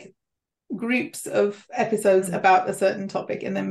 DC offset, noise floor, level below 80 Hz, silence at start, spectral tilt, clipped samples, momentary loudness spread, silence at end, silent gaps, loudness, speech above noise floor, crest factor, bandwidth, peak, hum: under 0.1%; -85 dBFS; -72 dBFS; 0 s; -5 dB/octave; under 0.1%; 10 LU; 0 s; none; -23 LUFS; 63 dB; 18 dB; 12.5 kHz; -6 dBFS; none